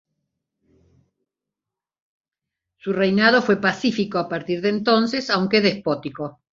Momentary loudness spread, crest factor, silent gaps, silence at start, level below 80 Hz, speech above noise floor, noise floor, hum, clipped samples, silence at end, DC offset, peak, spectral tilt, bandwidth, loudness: 11 LU; 20 dB; none; 2.85 s; -62 dBFS; 68 dB; -88 dBFS; none; under 0.1%; 0.25 s; under 0.1%; -4 dBFS; -5.5 dB/octave; 7.6 kHz; -20 LUFS